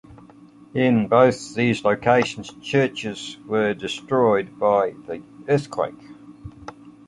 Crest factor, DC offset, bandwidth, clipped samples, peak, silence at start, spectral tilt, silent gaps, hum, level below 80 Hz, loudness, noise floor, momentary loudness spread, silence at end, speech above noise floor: 20 dB; under 0.1%; 11 kHz; under 0.1%; -2 dBFS; 0.1 s; -6 dB/octave; none; none; -56 dBFS; -21 LUFS; -47 dBFS; 18 LU; 0.15 s; 27 dB